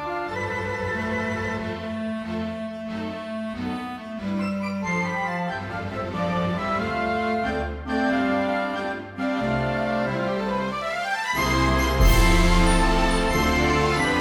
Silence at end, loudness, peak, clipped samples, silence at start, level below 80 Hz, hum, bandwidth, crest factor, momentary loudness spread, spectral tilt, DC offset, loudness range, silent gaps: 0 s; -24 LUFS; -6 dBFS; under 0.1%; 0 s; -30 dBFS; none; 16 kHz; 18 dB; 11 LU; -5 dB/octave; under 0.1%; 8 LU; none